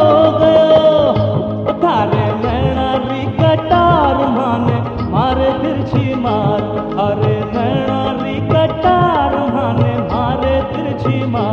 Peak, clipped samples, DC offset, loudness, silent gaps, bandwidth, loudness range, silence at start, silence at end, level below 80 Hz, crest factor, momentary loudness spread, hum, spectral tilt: 0 dBFS; under 0.1%; under 0.1%; -14 LUFS; none; 6.8 kHz; 3 LU; 0 s; 0 s; -32 dBFS; 12 dB; 7 LU; none; -9 dB/octave